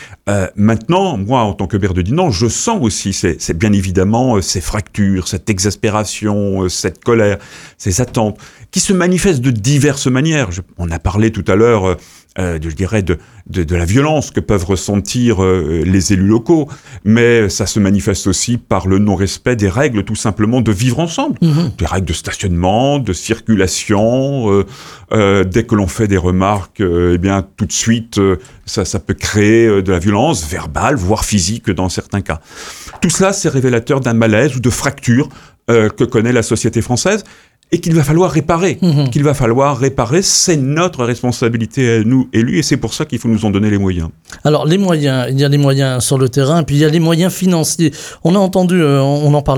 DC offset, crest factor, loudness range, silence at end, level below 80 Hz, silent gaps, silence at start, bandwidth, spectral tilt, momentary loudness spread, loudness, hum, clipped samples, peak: under 0.1%; 12 dB; 3 LU; 0 s; -34 dBFS; none; 0 s; 17.5 kHz; -5.5 dB/octave; 7 LU; -14 LUFS; none; under 0.1%; 0 dBFS